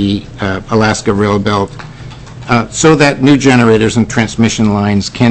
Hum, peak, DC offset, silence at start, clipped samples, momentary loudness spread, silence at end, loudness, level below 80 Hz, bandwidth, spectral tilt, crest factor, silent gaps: none; 0 dBFS; under 0.1%; 0 s; under 0.1%; 14 LU; 0 s; -11 LUFS; -34 dBFS; 8.6 kHz; -5.5 dB/octave; 10 dB; none